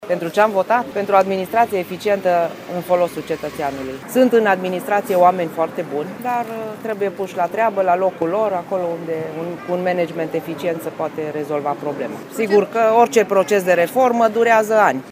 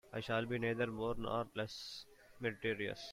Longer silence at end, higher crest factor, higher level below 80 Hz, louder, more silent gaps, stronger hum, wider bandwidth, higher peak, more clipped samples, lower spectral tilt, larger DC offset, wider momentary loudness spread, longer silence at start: about the same, 0 s vs 0 s; about the same, 18 dB vs 16 dB; about the same, -62 dBFS vs -62 dBFS; first, -18 LUFS vs -40 LUFS; neither; neither; about the same, 15.5 kHz vs 16 kHz; first, 0 dBFS vs -24 dBFS; neither; about the same, -5.5 dB/octave vs -5.5 dB/octave; neither; about the same, 11 LU vs 10 LU; about the same, 0 s vs 0.05 s